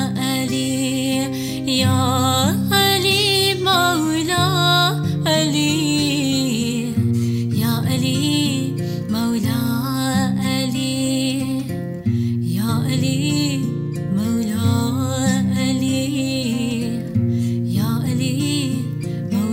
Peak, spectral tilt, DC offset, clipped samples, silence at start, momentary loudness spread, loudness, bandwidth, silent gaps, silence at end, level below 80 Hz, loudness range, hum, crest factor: -2 dBFS; -5 dB/octave; under 0.1%; under 0.1%; 0 s; 7 LU; -19 LUFS; 16.5 kHz; none; 0 s; -50 dBFS; 5 LU; none; 16 dB